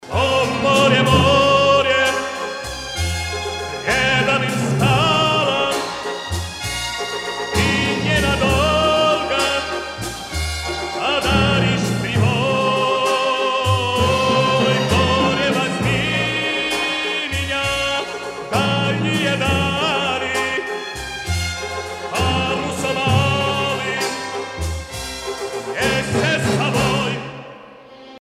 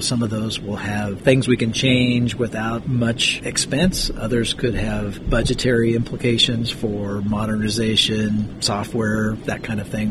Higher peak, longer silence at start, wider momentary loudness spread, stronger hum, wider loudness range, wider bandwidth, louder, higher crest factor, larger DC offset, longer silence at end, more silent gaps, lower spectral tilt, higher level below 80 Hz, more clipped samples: about the same, -2 dBFS vs -2 dBFS; about the same, 0 s vs 0 s; first, 11 LU vs 8 LU; neither; about the same, 4 LU vs 2 LU; first, 16 kHz vs 13 kHz; about the same, -18 LUFS vs -20 LUFS; about the same, 16 dB vs 18 dB; neither; about the same, 0 s vs 0 s; neither; about the same, -4.5 dB/octave vs -4.5 dB/octave; about the same, -36 dBFS vs -34 dBFS; neither